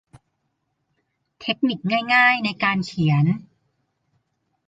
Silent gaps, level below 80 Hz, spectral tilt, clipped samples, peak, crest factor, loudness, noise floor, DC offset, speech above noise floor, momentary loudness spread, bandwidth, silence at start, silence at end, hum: none; -62 dBFS; -6.5 dB/octave; under 0.1%; -4 dBFS; 20 dB; -20 LUFS; -74 dBFS; under 0.1%; 54 dB; 11 LU; 9 kHz; 1.4 s; 1.3 s; none